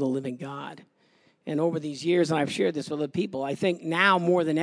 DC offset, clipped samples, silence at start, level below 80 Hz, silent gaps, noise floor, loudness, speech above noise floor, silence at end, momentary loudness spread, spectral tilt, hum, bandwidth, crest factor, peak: under 0.1%; under 0.1%; 0 s; -76 dBFS; none; -64 dBFS; -26 LUFS; 38 dB; 0 s; 15 LU; -5.5 dB/octave; none; 11 kHz; 20 dB; -6 dBFS